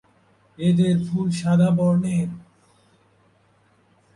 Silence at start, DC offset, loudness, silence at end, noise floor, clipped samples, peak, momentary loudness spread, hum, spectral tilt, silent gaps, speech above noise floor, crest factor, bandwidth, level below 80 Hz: 0.6 s; under 0.1%; -21 LUFS; 1.75 s; -60 dBFS; under 0.1%; -8 dBFS; 8 LU; none; -8 dB/octave; none; 41 dB; 14 dB; 11 kHz; -58 dBFS